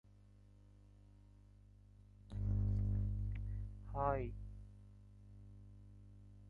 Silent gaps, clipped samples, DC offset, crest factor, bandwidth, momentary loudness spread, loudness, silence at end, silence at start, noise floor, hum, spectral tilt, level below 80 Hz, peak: none; under 0.1%; under 0.1%; 20 dB; 4.2 kHz; 27 LU; -42 LUFS; 0 s; 2.2 s; -64 dBFS; 50 Hz at -45 dBFS; -10.5 dB/octave; -48 dBFS; -22 dBFS